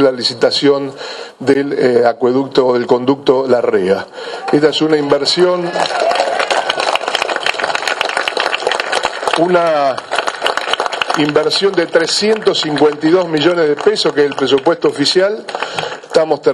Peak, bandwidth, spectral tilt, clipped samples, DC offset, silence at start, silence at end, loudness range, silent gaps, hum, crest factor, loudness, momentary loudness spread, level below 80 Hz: 0 dBFS; 12 kHz; -4 dB/octave; under 0.1%; under 0.1%; 0 s; 0 s; 2 LU; none; none; 14 dB; -14 LUFS; 5 LU; -58 dBFS